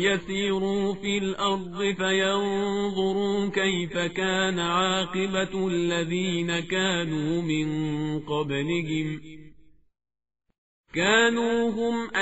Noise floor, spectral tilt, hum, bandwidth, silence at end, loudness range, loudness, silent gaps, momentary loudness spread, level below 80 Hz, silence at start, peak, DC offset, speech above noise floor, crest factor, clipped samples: -56 dBFS; -3.5 dB/octave; none; 8 kHz; 0 s; 4 LU; -26 LUFS; 10.58-10.84 s; 5 LU; -56 dBFS; 0 s; -8 dBFS; 0.3%; 30 dB; 18 dB; under 0.1%